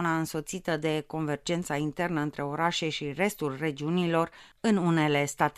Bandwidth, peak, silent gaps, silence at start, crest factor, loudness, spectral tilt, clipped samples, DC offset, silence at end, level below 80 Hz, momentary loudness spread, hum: 15 kHz; -10 dBFS; none; 0 s; 20 dB; -29 LUFS; -5 dB/octave; under 0.1%; under 0.1%; 0.05 s; -60 dBFS; 7 LU; none